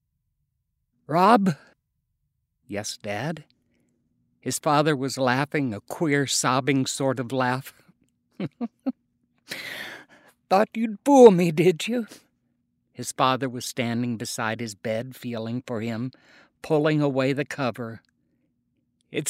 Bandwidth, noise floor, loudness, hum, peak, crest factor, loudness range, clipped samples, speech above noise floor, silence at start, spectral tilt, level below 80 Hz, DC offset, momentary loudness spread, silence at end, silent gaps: 16 kHz; -76 dBFS; -24 LUFS; none; 0 dBFS; 24 dB; 9 LU; under 0.1%; 53 dB; 1.1 s; -5 dB/octave; -72 dBFS; under 0.1%; 16 LU; 0 s; none